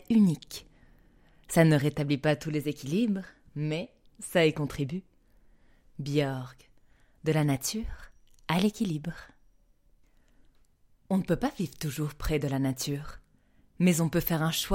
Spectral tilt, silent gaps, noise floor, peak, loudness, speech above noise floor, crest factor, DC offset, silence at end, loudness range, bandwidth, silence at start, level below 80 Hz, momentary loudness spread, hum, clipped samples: -5.5 dB/octave; none; -63 dBFS; -8 dBFS; -29 LUFS; 35 dB; 22 dB; under 0.1%; 0 s; 6 LU; 16.5 kHz; 0.1 s; -50 dBFS; 18 LU; none; under 0.1%